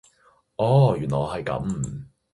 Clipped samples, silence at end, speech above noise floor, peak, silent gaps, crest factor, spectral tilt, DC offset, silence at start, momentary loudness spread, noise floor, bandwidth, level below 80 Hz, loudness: under 0.1%; 0.3 s; 39 dB; -6 dBFS; none; 18 dB; -7.5 dB/octave; under 0.1%; 0.6 s; 16 LU; -61 dBFS; 11 kHz; -48 dBFS; -23 LUFS